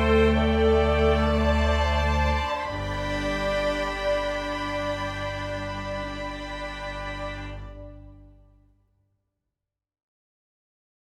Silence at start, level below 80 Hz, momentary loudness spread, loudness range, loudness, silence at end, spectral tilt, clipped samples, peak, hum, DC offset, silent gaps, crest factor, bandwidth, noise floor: 0 s; -32 dBFS; 13 LU; 15 LU; -26 LUFS; 2.8 s; -6 dB/octave; under 0.1%; -10 dBFS; none; under 0.1%; none; 18 dB; 10.5 kHz; -85 dBFS